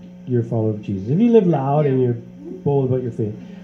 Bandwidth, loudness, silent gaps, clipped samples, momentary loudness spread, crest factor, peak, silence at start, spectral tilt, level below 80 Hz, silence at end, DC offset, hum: 6.4 kHz; -19 LUFS; none; under 0.1%; 12 LU; 18 dB; -2 dBFS; 0 s; -10.5 dB/octave; -56 dBFS; 0 s; under 0.1%; none